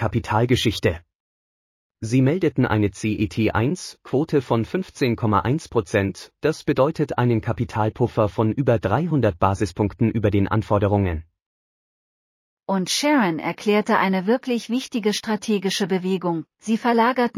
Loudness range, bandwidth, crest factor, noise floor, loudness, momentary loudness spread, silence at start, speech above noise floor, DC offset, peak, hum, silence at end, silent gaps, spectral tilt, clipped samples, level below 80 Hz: 2 LU; 15 kHz; 18 dB; under -90 dBFS; -22 LUFS; 6 LU; 0 s; over 69 dB; under 0.1%; -4 dBFS; none; 0 s; 1.15-1.90 s, 11.42-12.57 s; -6 dB/octave; under 0.1%; -46 dBFS